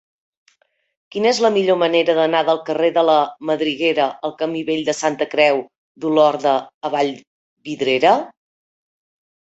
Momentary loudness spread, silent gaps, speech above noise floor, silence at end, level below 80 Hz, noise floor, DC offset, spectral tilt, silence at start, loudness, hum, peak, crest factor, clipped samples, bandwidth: 9 LU; 5.77-5.95 s, 6.74-6.81 s, 7.27-7.57 s; 44 dB; 1.15 s; -66 dBFS; -61 dBFS; under 0.1%; -4 dB/octave; 1.15 s; -18 LUFS; none; -2 dBFS; 18 dB; under 0.1%; 8.2 kHz